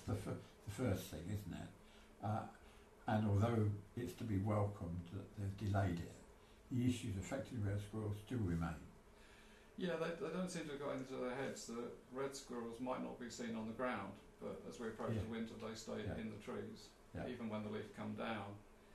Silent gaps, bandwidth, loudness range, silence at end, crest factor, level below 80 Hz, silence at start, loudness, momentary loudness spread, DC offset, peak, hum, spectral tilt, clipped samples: none; 13 kHz; 5 LU; 0 s; 18 dB; -64 dBFS; 0 s; -45 LUFS; 15 LU; under 0.1%; -26 dBFS; none; -6.5 dB/octave; under 0.1%